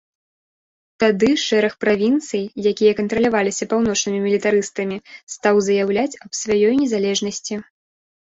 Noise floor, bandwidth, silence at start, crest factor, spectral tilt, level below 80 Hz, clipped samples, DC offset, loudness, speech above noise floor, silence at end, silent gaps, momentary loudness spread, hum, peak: under -90 dBFS; 8 kHz; 1 s; 16 dB; -4 dB/octave; -56 dBFS; under 0.1%; under 0.1%; -19 LUFS; over 72 dB; 0.7 s; 5.23-5.27 s; 10 LU; none; -4 dBFS